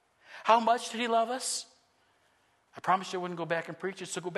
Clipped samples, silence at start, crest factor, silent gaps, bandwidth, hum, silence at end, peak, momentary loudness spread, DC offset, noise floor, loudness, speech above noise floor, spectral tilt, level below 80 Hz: under 0.1%; 0.3 s; 22 dB; none; 12.5 kHz; none; 0 s; -10 dBFS; 13 LU; under 0.1%; -69 dBFS; -30 LUFS; 39 dB; -3 dB/octave; -84 dBFS